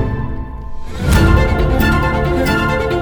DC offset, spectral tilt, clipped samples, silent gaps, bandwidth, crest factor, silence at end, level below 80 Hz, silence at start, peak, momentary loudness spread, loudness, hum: under 0.1%; -6.5 dB/octave; under 0.1%; none; over 20 kHz; 14 dB; 0 s; -18 dBFS; 0 s; 0 dBFS; 16 LU; -15 LUFS; none